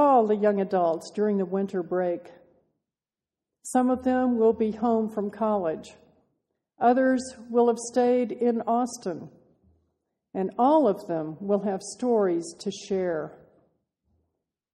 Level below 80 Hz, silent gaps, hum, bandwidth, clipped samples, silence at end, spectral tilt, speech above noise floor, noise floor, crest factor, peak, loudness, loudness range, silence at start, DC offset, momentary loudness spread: -66 dBFS; none; none; 12.5 kHz; under 0.1%; 1.4 s; -6 dB/octave; over 65 dB; under -90 dBFS; 18 dB; -8 dBFS; -25 LUFS; 4 LU; 0 s; under 0.1%; 11 LU